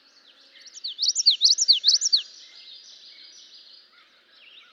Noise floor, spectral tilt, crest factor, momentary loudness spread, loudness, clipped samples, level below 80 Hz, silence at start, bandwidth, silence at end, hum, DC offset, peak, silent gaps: -57 dBFS; 7 dB/octave; 20 dB; 18 LU; -18 LUFS; under 0.1%; under -90 dBFS; 0.65 s; 12.5 kHz; 2 s; none; under 0.1%; -6 dBFS; none